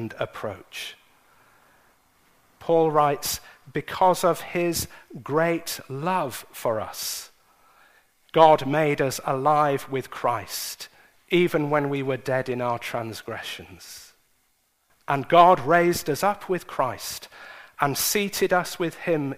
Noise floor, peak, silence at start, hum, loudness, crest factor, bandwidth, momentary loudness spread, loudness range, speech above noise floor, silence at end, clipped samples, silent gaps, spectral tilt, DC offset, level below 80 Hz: -68 dBFS; -2 dBFS; 0 s; none; -24 LUFS; 24 dB; 15.5 kHz; 16 LU; 6 LU; 45 dB; 0 s; under 0.1%; none; -4.5 dB/octave; under 0.1%; -58 dBFS